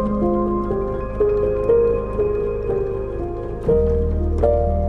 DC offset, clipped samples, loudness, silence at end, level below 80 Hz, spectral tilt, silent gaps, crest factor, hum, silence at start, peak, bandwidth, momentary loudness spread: under 0.1%; under 0.1%; -20 LUFS; 0 s; -26 dBFS; -11 dB/octave; none; 14 dB; none; 0 s; -4 dBFS; 4.3 kHz; 8 LU